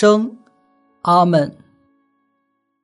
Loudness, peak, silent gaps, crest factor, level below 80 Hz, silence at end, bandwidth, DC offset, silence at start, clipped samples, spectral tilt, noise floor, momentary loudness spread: -17 LUFS; -2 dBFS; none; 18 dB; -68 dBFS; 1.35 s; 10.5 kHz; under 0.1%; 0 s; under 0.1%; -6.5 dB/octave; -70 dBFS; 13 LU